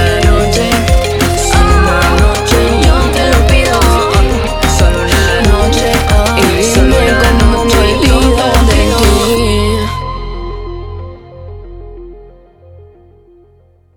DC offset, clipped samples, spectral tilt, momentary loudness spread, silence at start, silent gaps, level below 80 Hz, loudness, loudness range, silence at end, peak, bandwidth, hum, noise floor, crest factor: under 0.1%; under 0.1%; -4.5 dB/octave; 15 LU; 0 s; none; -14 dBFS; -10 LUFS; 11 LU; 1.75 s; 0 dBFS; 18.5 kHz; none; -46 dBFS; 10 dB